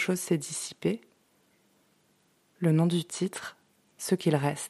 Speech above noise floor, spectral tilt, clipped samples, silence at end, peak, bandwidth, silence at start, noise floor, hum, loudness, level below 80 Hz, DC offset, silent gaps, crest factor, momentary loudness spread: 40 dB; -5.5 dB/octave; under 0.1%; 0 s; -10 dBFS; 13.5 kHz; 0 s; -68 dBFS; none; -29 LUFS; -74 dBFS; under 0.1%; none; 20 dB; 13 LU